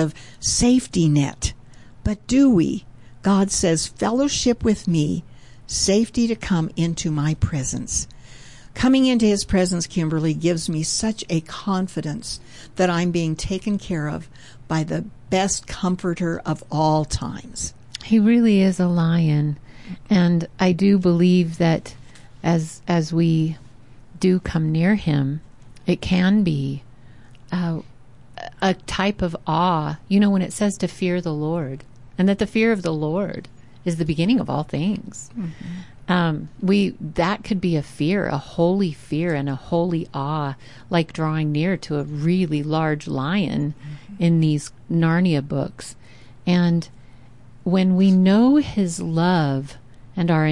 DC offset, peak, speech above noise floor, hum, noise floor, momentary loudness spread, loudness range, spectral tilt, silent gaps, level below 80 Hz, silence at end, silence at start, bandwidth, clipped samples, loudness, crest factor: 0.5%; -8 dBFS; 27 dB; none; -47 dBFS; 13 LU; 5 LU; -5.5 dB/octave; none; -44 dBFS; 0 s; 0 s; 11.5 kHz; under 0.1%; -21 LUFS; 14 dB